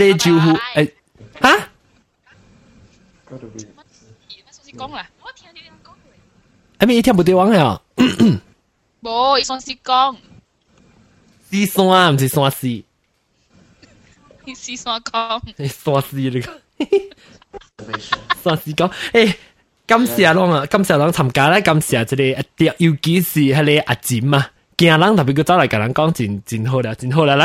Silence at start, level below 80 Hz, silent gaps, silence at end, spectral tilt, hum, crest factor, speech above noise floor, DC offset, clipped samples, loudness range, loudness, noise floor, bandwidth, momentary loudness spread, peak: 0 s; -50 dBFS; none; 0 s; -5.5 dB/octave; none; 18 dB; 49 dB; under 0.1%; under 0.1%; 11 LU; -16 LUFS; -64 dBFS; 16.5 kHz; 16 LU; 0 dBFS